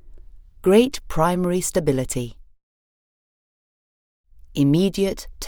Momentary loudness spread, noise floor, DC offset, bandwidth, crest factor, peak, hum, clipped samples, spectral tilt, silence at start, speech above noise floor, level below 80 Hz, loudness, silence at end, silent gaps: 11 LU; -42 dBFS; under 0.1%; 20 kHz; 20 dB; -2 dBFS; none; under 0.1%; -5.5 dB/octave; 0.05 s; 22 dB; -42 dBFS; -21 LUFS; 0 s; 2.63-4.24 s